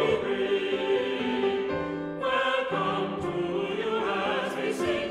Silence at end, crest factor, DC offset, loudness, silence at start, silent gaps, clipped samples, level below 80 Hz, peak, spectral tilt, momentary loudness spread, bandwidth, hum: 0 s; 14 dB; under 0.1%; -28 LUFS; 0 s; none; under 0.1%; -58 dBFS; -14 dBFS; -5.5 dB/octave; 4 LU; 12.5 kHz; none